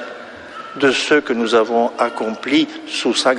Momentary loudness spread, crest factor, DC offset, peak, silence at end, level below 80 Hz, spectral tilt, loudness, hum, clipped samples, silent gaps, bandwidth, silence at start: 17 LU; 16 dB; under 0.1%; -2 dBFS; 0 s; -62 dBFS; -3 dB/octave; -17 LUFS; none; under 0.1%; none; 10.5 kHz; 0 s